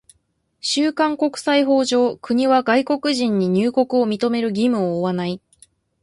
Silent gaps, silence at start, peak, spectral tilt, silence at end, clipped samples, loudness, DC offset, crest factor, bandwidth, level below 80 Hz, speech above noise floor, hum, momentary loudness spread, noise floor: none; 0.65 s; -4 dBFS; -5 dB/octave; 0.65 s; under 0.1%; -19 LUFS; under 0.1%; 14 dB; 11.5 kHz; -62 dBFS; 49 dB; none; 6 LU; -67 dBFS